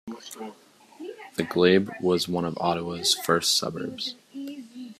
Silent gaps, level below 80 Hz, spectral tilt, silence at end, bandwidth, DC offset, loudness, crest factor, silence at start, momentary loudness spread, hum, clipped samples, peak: none; -66 dBFS; -3.5 dB/octave; 0.05 s; 15 kHz; under 0.1%; -24 LUFS; 20 dB; 0.05 s; 20 LU; none; under 0.1%; -6 dBFS